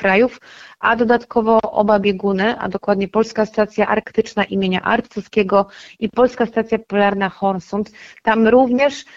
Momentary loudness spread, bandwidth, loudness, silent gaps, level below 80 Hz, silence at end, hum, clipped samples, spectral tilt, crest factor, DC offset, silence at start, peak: 7 LU; 7.6 kHz; -17 LUFS; none; -50 dBFS; 0.15 s; none; under 0.1%; -6.5 dB/octave; 16 dB; under 0.1%; 0 s; -2 dBFS